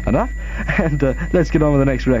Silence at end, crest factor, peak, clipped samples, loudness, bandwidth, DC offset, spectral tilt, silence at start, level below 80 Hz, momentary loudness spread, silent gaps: 0 s; 14 dB; -2 dBFS; under 0.1%; -18 LUFS; 7.6 kHz; under 0.1%; -8 dB/octave; 0 s; -24 dBFS; 6 LU; none